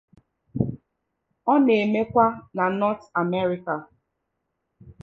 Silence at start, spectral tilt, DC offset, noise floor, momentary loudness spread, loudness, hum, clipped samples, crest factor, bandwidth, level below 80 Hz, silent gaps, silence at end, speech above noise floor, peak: 0.55 s; -8.5 dB/octave; under 0.1%; -78 dBFS; 11 LU; -23 LUFS; none; under 0.1%; 20 dB; 6.4 kHz; -56 dBFS; none; 0.1 s; 56 dB; -6 dBFS